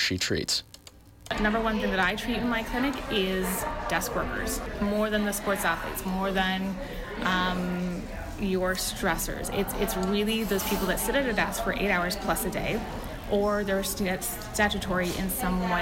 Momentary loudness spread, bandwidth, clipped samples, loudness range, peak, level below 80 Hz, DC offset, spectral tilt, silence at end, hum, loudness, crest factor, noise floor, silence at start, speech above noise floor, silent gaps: 5 LU; 17 kHz; under 0.1%; 2 LU; -14 dBFS; -40 dBFS; under 0.1%; -4 dB/octave; 0 s; none; -28 LUFS; 14 dB; -51 dBFS; 0 s; 23 dB; none